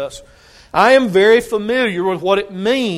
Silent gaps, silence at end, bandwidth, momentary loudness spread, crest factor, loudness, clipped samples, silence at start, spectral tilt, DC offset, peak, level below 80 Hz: none; 0 s; 15 kHz; 8 LU; 16 dB; -14 LUFS; under 0.1%; 0 s; -5 dB/octave; under 0.1%; 0 dBFS; -50 dBFS